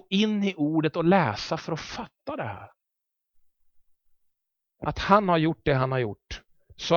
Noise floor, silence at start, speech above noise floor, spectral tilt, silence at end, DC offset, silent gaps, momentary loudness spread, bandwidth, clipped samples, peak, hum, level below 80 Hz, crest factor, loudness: -84 dBFS; 0.1 s; 59 dB; -6.5 dB/octave; 0 s; under 0.1%; none; 15 LU; 7.2 kHz; under 0.1%; -4 dBFS; none; -52 dBFS; 22 dB; -25 LUFS